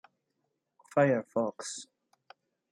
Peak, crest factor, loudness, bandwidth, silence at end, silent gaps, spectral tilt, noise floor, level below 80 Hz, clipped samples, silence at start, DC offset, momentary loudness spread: -12 dBFS; 22 dB; -31 LUFS; 11.5 kHz; 0.9 s; none; -5.5 dB/octave; -81 dBFS; -80 dBFS; under 0.1%; 0.95 s; under 0.1%; 14 LU